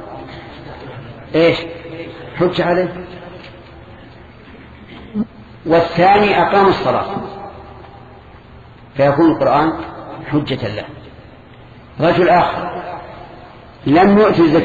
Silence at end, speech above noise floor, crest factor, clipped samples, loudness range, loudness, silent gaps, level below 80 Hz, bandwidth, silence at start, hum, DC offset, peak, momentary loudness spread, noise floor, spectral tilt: 0 s; 26 dB; 16 dB; under 0.1%; 7 LU; -15 LUFS; none; -44 dBFS; 7.4 kHz; 0 s; none; under 0.1%; 0 dBFS; 23 LU; -39 dBFS; -8 dB/octave